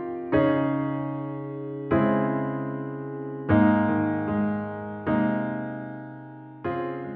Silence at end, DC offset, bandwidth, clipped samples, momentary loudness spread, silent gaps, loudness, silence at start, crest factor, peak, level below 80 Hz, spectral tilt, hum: 0 s; under 0.1%; 4.3 kHz; under 0.1%; 13 LU; none; -26 LUFS; 0 s; 18 dB; -8 dBFS; -54 dBFS; -7.5 dB/octave; none